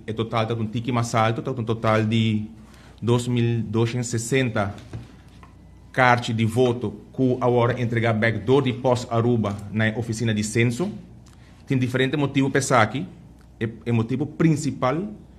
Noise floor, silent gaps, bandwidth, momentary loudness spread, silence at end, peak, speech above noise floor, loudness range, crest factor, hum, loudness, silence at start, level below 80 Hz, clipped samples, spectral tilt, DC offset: -47 dBFS; none; 13 kHz; 10 LU; 0.05 s; 0 dBFS; 25 dB; 3 LU; 22 dB; none; -23 LUFS; 0.1 s; -52 dBFS; under 0.1%; -6 dB/octave; under 0.1%